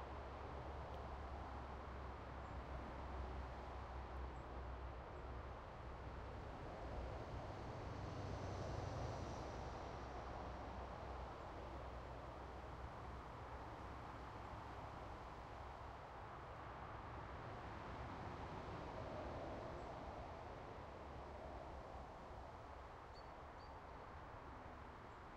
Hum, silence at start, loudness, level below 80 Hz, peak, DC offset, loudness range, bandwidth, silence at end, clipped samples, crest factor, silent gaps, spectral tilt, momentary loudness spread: none; 0 s; -53 LUFS; -58 dBFS; -34 dBFS; under 0.1%; 5 LU; 9.8 kHz; 0 s; under 0.1%; 16 dB; none; -6.5 dB/octave; 6 LU